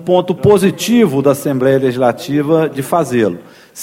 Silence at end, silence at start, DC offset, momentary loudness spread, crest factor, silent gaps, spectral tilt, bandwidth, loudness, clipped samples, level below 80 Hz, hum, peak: 0 s; 0 s; under 0.1%; 5 LU; 12 dB; none; -6 dB/octave; 16.5 kHz; -13 LUFS; under 0.1%; -50 dBFS; none; 0 dBFS